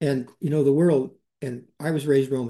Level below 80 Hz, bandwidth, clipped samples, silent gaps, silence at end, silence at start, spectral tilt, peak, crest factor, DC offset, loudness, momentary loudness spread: -68 dBFS; 12.5 kHz; under 0.1%; none; 0 s; 0 s; -8 dB/octave; -10 dBFS; 14 dB; under 0.1%; -23 LUFS; 15 LU